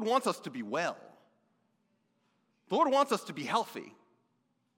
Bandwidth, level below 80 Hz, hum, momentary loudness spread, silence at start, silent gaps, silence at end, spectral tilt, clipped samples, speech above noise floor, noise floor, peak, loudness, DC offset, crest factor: 16.5 kHz; under -90 dBFS; none; 13 LU; 0 s; none; 0.9 s; -4 dB/octave; under 0.1%; 45 dB; -77 dBFS; -14 dBFS; -32 LUFS; under 0.1%; 22 dB